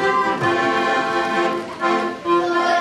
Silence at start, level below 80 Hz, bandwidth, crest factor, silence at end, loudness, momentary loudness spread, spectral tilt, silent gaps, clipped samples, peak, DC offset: 0 s; -60 dBFS; 12 kHz; 12 dB; 0 s; -19 LUFS; 3 LU; -4.5 dB/octave; none; under 0.1%; -6 dBFS; under 0.1%